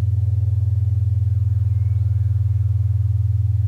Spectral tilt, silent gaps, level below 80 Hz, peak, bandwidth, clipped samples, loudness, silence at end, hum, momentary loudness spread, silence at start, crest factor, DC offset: -10 dB/octave; none; -34 dBFS; -12 dBFS; 1.3 kHz; under 0.1%; -20 LUFS; 0 s; none; 0 LU; 0 s; 6 dB; under 0.1%